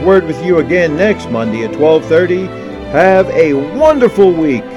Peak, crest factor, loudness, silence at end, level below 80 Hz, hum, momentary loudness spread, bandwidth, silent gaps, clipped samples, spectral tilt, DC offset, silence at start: 0 dBFS; 10 dB; -11 LUFS; 0 s; -38 dBFS; none; 8 LU; 11 kHz; none; 0.8%; -7 dB/octave; under 0.1%; 0 s